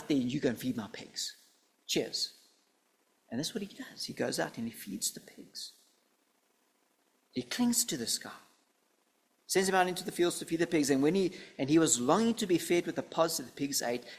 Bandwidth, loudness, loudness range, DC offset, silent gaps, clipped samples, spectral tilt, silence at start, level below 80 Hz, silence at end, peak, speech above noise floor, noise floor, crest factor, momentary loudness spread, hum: 16 kHz; -32 LUFS; 10 LU; under 0.1%; none; under 0.1%; -3.5 dB/octave; 0 s; -72 dBFS; 0 s; -10 dBFS; 42 dB; -74 dBFS; 22 dB; 14 LU; none